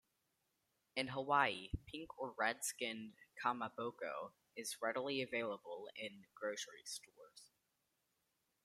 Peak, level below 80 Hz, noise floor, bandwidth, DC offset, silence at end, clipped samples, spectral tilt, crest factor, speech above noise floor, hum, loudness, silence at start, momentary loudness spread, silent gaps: -20 dBFS; -66 dBFS; -85 dBFS; 16 kHz; under 0.1%; 1.2 s; under 0.1%; -3 dB/octave; 26 dB; 42 dB; none; -43 LUFS; 0.95 s; 13 LU; none